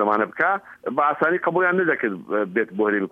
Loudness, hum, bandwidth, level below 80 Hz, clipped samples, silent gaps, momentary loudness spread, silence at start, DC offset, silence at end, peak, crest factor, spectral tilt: -22 LUFS; none; 5 kHz; -72 dBFS; under 0.1%; none; 5 LU; 0 s; under 0.1%; 0.05 s; -6 dBFS; 16 dB; -8.5 dB/octave